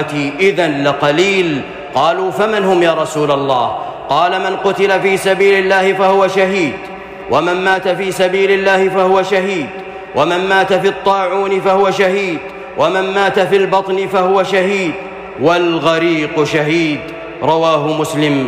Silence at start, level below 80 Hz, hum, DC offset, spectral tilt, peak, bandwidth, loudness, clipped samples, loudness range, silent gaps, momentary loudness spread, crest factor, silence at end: 0 s; -50 dBFS; none; under 0.1%; -5 dB/octave; -2 dBFS; 15 kHz; -13 LUFS; under 0.1%; 2 LU; none; 8 LU; 10 dB; 0 s